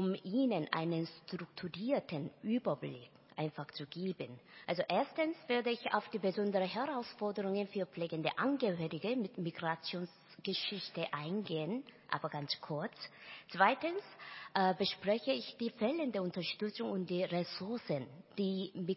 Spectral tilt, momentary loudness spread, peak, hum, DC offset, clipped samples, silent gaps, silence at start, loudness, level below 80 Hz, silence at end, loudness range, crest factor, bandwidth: -9 dB/octave; 11 LU; -14 dBFS; none; under 0.1%; under 0.1%; none; 0 s; -38 LUFS; -82 dBFS; 0 s; 4 LU; 24 dB; 5.8 kHz